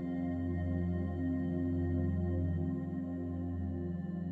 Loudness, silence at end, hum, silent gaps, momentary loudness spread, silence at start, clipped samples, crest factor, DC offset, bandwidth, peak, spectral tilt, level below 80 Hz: -36 LUFS; 0 s; none; none; 5 LU; 0 s; under 0.1%; 12 dB; under 0.1%; 3.3 kHz; -22 dBFS; -11 dB/octave; -56 dBFS